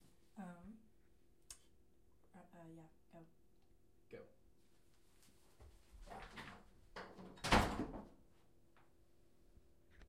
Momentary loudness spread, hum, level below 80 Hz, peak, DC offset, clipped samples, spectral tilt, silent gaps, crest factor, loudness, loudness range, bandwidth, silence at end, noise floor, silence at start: 29 LU; none; -58 dBFS; -18 dBFS; under 0.1%; under 0.1%; -4.5 dB/octave; none; 32 dB; -43 LUFS; 21 LU; 15.5 kHz; 0.05 s; -75 dBFS; 0.35 s